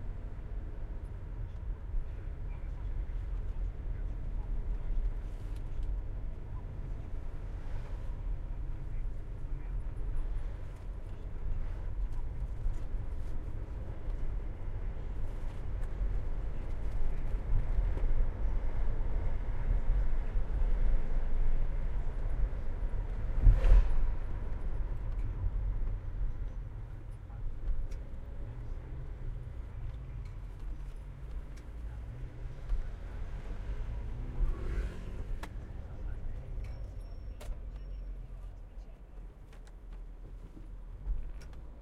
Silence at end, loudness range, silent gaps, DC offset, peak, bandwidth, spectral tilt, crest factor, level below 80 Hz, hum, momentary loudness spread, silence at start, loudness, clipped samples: 0 s; 11 LU; none; under 0.1%; -10 dBFS; 3.7 kHz; -8 dB/octave; 22 dB; -34 dBFS; none; 10 LU; 0 s; -40 LUFS; under 0.1%